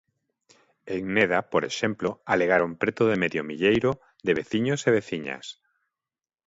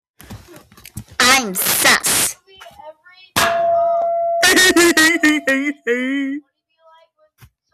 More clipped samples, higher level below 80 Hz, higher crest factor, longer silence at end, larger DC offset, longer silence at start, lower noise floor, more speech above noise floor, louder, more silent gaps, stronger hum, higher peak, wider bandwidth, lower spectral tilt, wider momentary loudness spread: neither; second, -60 dBFS vs -50 dBFS; first, 20 dB vs 14 dB; second, 0.95 s vs 1.35 s; neither; first, 0.85 s vs 0.3 s; first, under -90 dBFS vs -53 dBFS; first, over 65 dB vs 35 dB; second, -25 LUFS vs -14 LUFS; neither; neither; about the same, -6 dBFS vs -4 dBFS; second, 8 kHz vs 17 kHz; first, -5.5 dB/octave vs -1.5 dB/octave; about the same, 10 LU vs 12 LU